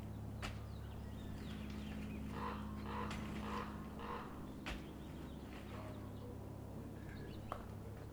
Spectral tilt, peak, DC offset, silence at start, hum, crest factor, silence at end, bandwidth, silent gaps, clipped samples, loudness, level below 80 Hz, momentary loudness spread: -6.5 dB/octave; -28 dBFS; under 0.1%; 0 s; none; 20 dB; 0 s; over 20 kHz; none; under 0.1%; -48 LUFS; -54 dBFS; 6 LU